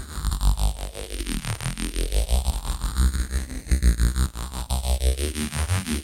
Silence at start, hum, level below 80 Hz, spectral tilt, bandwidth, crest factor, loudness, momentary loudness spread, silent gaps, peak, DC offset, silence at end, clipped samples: 0 s; none; -24 dBFS; -4.5 dB/octave; 16.5 kHz; 18 dB; -26 LUFS; 7 LU; none; -6 dBFS; under 0.1%; 0 s; under 0.1%